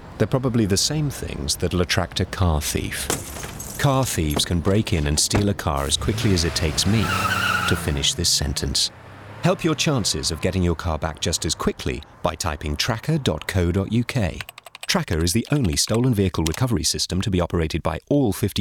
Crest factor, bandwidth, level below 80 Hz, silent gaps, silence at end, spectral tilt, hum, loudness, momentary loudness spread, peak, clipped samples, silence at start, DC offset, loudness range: 20 dB; 19.5 kHz; -34 dBFS; none; 0 s; -4 dB/octave; none; -22 LUFS; 7 LU; -2 dBFS; under 0.1%; 0 s; under 0.1%; 3 LU